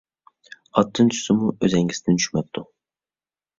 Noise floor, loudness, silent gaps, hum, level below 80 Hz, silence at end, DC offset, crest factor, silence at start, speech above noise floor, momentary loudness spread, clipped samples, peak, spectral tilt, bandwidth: under -90 dBFS; -21 LUFS; none; none; -56 dBFS; 0.95 s; under 0.1%; 20 dB; 0.75 s; over 70 dB; 9 LU; under 0.1%; -2 dBFS; -5 dB/octave; 7.8 kHz